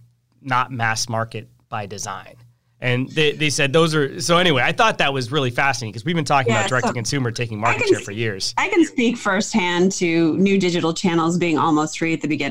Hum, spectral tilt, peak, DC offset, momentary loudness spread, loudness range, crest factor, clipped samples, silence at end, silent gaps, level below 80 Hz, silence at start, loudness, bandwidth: none; -4.5 dB/octave; -4 dBFS; 1%; 9 LU; 4 LU; 16 dB; under 0.1%; 0 s; none; -52 dBFS; 0 s; -19 LUFS; 16 kHz